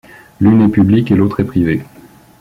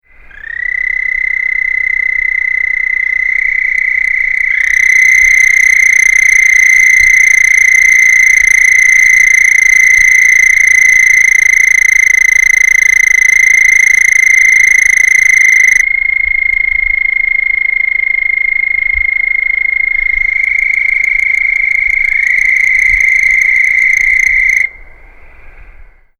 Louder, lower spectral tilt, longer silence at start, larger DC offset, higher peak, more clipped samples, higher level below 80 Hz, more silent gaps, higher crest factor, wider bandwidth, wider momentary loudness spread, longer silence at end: second, -12 LUFS vs -6 LUFS; first, -9.5 dB/octave vs 2 dB/octave; about the same, 0.4 s vs 0.3 s; neither; about the same, -2 dBFS vs 0 dBFS; neither; second, -42 dBFS vs -34 dBFS; neither; about the same, 10 dB vs 8 dB; second, 5.4 kHz vs over 20 kHz; about the same, 6 LU vs 6 LU; first, 0.55 s vs 0.35 s